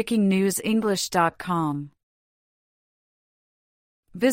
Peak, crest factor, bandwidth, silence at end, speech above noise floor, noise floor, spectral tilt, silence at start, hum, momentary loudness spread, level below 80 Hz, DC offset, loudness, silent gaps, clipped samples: -8 dBFS; 18 dB; 16 kHz; 0 s; over 67 dB; under -90 dBFS; -5 dB/octave; 0 s; none; 8 LU; -62 dBFS; under 0.1%; -23 LUFS; 2.03-4.03 s; under 0.1%